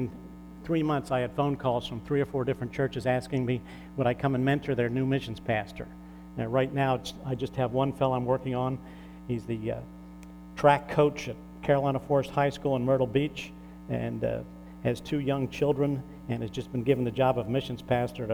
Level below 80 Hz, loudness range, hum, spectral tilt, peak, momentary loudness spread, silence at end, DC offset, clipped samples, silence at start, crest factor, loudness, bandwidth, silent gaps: -52 dBFS; 3 LU; none; -7.5 dB/octave; -8 dBFS; 14 LU; 0 s; under 0.1%; under 0.1%; 0 s; 22 dB; -29 LUFS; 16 kHz; none